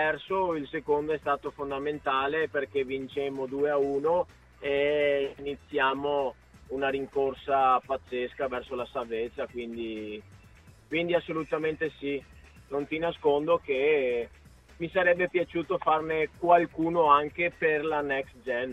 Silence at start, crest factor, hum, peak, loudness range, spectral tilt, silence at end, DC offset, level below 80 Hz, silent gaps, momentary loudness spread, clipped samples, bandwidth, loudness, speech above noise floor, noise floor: 0 s; 20 dB; none; -8 dBFS; 7 LU; -6.5 dB/octave; 0 s; under 0.1%; -58 dBFS; none; 11 LU; under 0.1%; 9.4 kHz; -28 LUFS; 26 dB; -54 dBFS